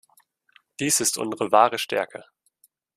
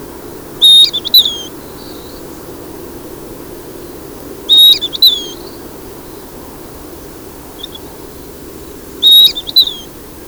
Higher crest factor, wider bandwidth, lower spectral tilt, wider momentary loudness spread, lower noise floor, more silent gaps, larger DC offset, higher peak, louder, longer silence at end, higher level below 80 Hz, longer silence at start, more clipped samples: first, 24 dB vs 14 dB; second, 15.5 kHz vs over 20 kHz; about the same, -2 dB/octave vs -1 dB/octave; second, 18 LU vs 27 LU; first, -64 dBFS vs -30 dBFS; neither; second, under 0.1% vs 0.1%; about the same, -2 dBFS vs 0 dBFS; second, -22 LUFS vs -6 LUFS; first, 0.75 s vs 0.05 s; second, -70 dBFS vs -42 dBFS; first, 0.8 s vs 0 s; neither